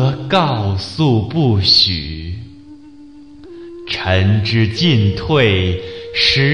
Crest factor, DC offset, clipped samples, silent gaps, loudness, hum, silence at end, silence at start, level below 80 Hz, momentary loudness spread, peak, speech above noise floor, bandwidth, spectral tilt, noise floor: 14 dB; 0.6%; under 0.1%; none; -14 LUFS; none; 0 s; 0 s; -40 dBFS; 17 LU; -2 dBFS; 24 dB; 10.5 kHz; -6 dB/octave; -39 dBFS